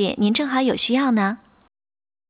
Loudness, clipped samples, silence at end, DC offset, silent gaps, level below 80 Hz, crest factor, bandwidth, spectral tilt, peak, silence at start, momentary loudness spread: -20 LUFS; under 0.1%; 0.95 s; under 0.1%; none; -60 dBFS; 14 dB; 4 kHz; -10 dB/octave; -8 dBFS; 0 s; 5 LU